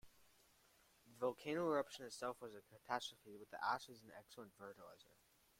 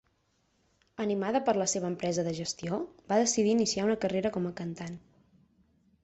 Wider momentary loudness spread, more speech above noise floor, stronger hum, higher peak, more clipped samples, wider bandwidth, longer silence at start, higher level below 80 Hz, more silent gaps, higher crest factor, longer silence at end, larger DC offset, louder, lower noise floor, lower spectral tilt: first, 19 LU vs 12 LU; second, 27 dB vs 43 dB; neither; second, -26 dBFS vs -14 dBFS; neither; first, 16.5 kHz vs 8.4 kHz; second, 0.05 s vs 1 s; second, -84 dBFS vs -66 dBFS; neither; first, 24 dB vs 18 dB; second, 0.55 s vs 1.05 s; neither; second, -46 LUFS vs -30 LUFS; about the same, -74 dBFS vs -73 dBFS; about the same, -4 dB/octave vs -4.5 dB/octave